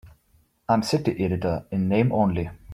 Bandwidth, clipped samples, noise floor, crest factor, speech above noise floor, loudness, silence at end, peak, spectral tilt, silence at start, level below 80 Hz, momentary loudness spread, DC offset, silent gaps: 15 kHz; under 0.1%; -63 dBFS; 18 dB; 40 dB; -24 LUFS; 0 s; -6 dBFS; -7 dB/octave; 0.05 s; -50 dBFS; 5 LU; under 0.1%; none